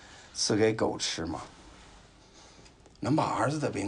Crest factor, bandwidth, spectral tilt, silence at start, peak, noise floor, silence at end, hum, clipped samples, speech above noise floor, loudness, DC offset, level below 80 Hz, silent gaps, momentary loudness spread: 18 dB; 11 kHz; -4.5 dB/octave; 0 s; -14 dBFS; -55 dBFS; 0 s; none; under 0.1%; 26 dB; -29 LUFS; under 0.1%; -58 dBFS; none; 14 LU